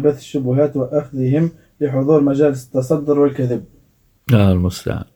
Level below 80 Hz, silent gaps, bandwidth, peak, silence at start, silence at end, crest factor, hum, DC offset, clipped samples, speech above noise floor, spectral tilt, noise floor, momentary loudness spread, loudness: -44 dBFS; none; 18.5 kHz; 0 dBFS; 0 s; 0.1 s; 16 dB; none; under 0.1%; under 0.1%; 39 dB; -8 dB/octave; -55 dBFS; 8 LU; -17 LUFS